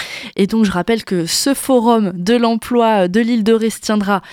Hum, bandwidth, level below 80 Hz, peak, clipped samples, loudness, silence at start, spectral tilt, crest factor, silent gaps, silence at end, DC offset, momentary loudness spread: none; 17 kHz; -48 dBFS; -2 dBFS; under 0.1%; -15 LUFS; 0 s; -4.5 dB/octave; 12 dB; none; 0 s; under 0.1%; 4 LU